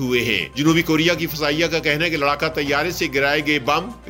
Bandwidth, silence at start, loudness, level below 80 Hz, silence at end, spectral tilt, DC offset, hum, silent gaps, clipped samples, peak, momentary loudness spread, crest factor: 16.5 kHz; 0 s; -19 LUFS; -44 dBFS; 0 s; -4.5 dB/octave; under 0.1%; none; none; under 0.1%; -4 dBFS; 3 LU; 16 dB